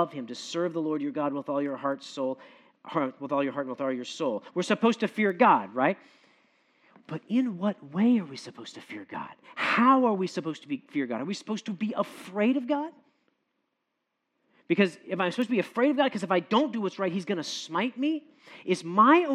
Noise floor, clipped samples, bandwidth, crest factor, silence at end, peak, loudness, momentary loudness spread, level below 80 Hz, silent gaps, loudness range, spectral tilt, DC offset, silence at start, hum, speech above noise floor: -81 dBFS; under 0.1%; 12 kHz; 20 dB; 0 s; -8 dBFS; -28 LUFS; 16 LU; -88 dBFS; none; 5 LU; -5.5 dB/octave; under 0.1%; 0 s; none; 53 dB